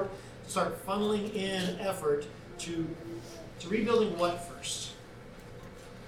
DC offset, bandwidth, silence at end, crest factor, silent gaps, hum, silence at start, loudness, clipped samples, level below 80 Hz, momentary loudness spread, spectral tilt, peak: under 0.1%; 17 kHz; 0 s; 18 dB; none; none; 0 s; -33 LUFS; under 0.1%; -56 dBFS; 20 LU; -4.5 dB/octave; -16 dBFS